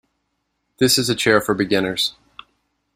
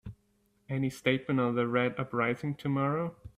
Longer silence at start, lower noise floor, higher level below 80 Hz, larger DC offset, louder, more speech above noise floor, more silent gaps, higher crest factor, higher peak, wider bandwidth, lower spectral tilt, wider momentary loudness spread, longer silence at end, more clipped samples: first, 0.8 s vs 0.05 s; about the same, -73 dBFS vs -71 dBFS; first, -54 dBFS vs -62 dBFS; neither; first, -18 LUFS vs -31 LUFS; first, 55 dB vs 41 dB; neither; about the same, 20 dB vs 20 dB; first, -2 dBFS vs -10 dBFS; first, 16 kHz vs 14 kHz; second, -3.5 dB/octave vs -7 dB/octave; about the same, 5 LU vs 6 LU; first, 0.85 s vs 0.1 s; neither